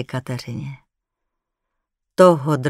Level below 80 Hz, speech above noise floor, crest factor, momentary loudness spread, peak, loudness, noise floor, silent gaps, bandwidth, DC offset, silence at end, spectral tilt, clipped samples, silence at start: -60 dBFS; 61 dB; 20 dB; 18 LU; 0 dBFS; -17 LUFS; -79 dBFS; none; 13.5 kHz; under 0.1%; 0 s; -7 dB/octave; under 0.1%; 0 s